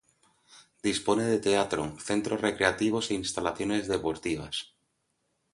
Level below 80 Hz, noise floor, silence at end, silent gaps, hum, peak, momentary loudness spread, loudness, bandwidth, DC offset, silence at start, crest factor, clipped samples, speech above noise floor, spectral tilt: -58 dBFS; -77 dBFS; 0.9 s; none; none; -6 dBFS; 7 LU; -29 LUFS; 11.5 kHz; under 0.1%; 0.55 s; 24 dB; under 0.1%; 48 dB; -4 dB/octave